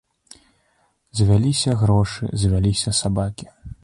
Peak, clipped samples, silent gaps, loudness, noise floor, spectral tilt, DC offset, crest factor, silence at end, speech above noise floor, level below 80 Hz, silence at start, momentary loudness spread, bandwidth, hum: -6 dBFS; under 0.1%; none; -20 LUFS; -64 dBFS; -5.5 dB/octave; under 0.1%; 14 dB; 0.1 s; 46 dB; -36 dBFS; 1.15 s; 12 LU; 11.5 kHz; none